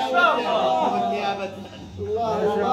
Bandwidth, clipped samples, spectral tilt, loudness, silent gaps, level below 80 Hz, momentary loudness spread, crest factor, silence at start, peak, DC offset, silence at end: 14 kHz; under 0.1%; -5 dB/octave; -22 LUFS; none; -56 dBFS; 15 LU; 16 dB; 0 s; -6 dBFS; under 0.1%; 0 s